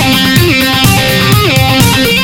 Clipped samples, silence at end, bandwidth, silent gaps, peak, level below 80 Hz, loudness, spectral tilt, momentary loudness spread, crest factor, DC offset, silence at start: 0.5%; 0 s; over 20 kHz; none; 0 dBFS; -26 dBFS; -7 LUFS; -4 dB/octave; 1 LU; 8 dB; 0.2%; 0 s